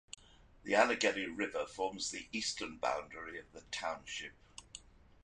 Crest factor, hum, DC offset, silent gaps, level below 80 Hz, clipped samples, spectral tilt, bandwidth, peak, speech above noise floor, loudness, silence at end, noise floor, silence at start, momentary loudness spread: 26 dB; none; under 0.1%; none; -66 dBFS; under 0.1%; -2 dB/octave; 11 kHz; -14 dBFS; 22 dB; -37 LUFS; 0.45 s; -59 dBFS; 0.65 s; 22 LU